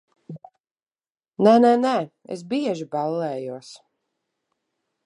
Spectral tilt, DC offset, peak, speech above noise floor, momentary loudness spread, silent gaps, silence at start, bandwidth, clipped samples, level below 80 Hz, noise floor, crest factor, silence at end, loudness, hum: -6.5 dB/octave; under 0.1%; -4 dBFS; over 69 dB; 26 LU; 0.60-0.64 s, 0.71-0.75 s, 1.10-1.15 s; 0.3 s; 11 kHz; under 0.1%; -78 dBFS; under -90 dBFS; 20 dB; 1.3 s; -21 LUFS; none